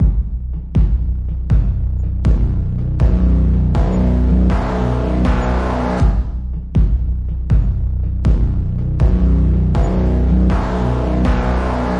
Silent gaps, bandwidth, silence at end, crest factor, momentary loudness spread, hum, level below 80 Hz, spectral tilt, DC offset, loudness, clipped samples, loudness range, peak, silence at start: none; 5.8 kHz; 0 s; 12 dB; 6 LU; none; -16 dBFS; -9 dB/octave; under 0.1%; -17 LUFS; under 0.1%; 2 LU; -2 dBFS; 0 s